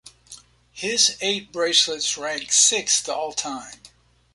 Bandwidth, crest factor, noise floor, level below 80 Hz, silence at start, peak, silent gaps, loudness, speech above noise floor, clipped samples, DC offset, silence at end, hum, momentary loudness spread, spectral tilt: 11.5 kHz; 22 dB; -47 dBFS; -64 dBFS; 0.05 s; -2 dBFS; none; -20 LUFS; 25 dB; under 0.1%; under 0.1%; 0.45 s; 60 Hz at -60 dBFS; 14 LU; 0.5 dB/octave